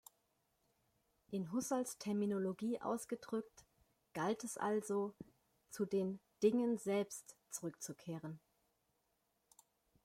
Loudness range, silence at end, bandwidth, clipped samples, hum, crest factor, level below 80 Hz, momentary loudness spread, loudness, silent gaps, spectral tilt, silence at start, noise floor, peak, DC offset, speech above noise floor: 3 LU; 1.65 s; 16 kHz; under 0.1%; none; 20 dB; -82 dBFS; 14 LU; -41 LUFS; none; -5.5 dB/octave; 1.3 s; -83 dBFS; -22 dBFS; under 0.1%; 43 dB